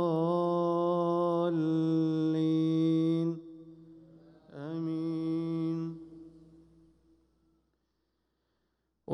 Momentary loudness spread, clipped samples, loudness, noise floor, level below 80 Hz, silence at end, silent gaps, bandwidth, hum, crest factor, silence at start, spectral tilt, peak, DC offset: 16 LU; under 0.1%; -30 LUFS; -79 dBFS; -74 dBFS; 0 s; none; 6.2 kHz; none; 14 dB; 0 s; -9.5 dB/octave; -18 dBFS; under 0.1%